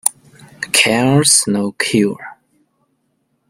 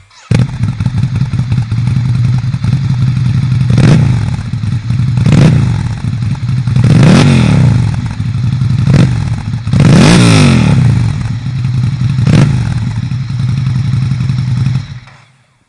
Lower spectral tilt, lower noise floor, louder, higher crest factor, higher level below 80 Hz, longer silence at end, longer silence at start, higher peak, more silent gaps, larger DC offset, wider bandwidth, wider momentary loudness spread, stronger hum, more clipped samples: second, -3 dB/octave vs -7 dB/octave; first, -66 dBFS vs -46 dBFS; second, -13 LUFS vs -10 LUFS; first, 18 dB vs 10 dB; second, -56 dBFS vs -28 dBFS; first, 1.15 s vs 0.7 s; second, 0.05 s vs 0.3 s; about the same, 0 dBFS vs 0 dBFS; neither; neither; first, over 20 kHz vs 11 kHz; first, 18 LU vs 10 LU; neither; second, under 0.1% vs 0.4%